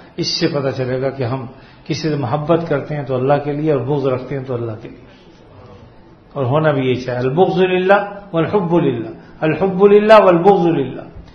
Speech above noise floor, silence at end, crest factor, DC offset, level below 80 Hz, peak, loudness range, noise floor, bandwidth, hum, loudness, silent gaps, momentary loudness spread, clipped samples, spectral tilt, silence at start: 28 dB; 0.1 s; 16 dB; under 0.1%; -48 dBFS; 0 dBFS; 8 LU; -43 dBFS; 6.6 kHz; none; -16 LUFS; none; 14 LU; under 0.1%; -7 dB/octave; 0.2 s